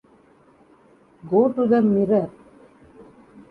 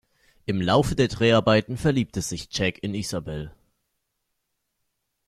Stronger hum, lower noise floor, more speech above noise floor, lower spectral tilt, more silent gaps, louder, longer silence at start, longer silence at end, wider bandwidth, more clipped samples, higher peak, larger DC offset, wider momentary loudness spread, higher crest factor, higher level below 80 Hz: neither; second, -55 dBFS vs -78 dBFS; second, 36 dB vs 54 dB; first, -10.5 dB/octave vs -5.5 dB/octave; neither; first, -20 LUFS vs -23 LUFS; first, 1.25 s vs 0.5 s; second, 0.5 s vs 1.8 s; second, 4.8 kHz vs 14.5 kHz; neither; about the same, -6 dBFS vs -6 dBFS; neither; second, 5 LU vs 14 LU; about the same, 18 dB vs 20 dB; second, -62 dBFS vs -46 dBFS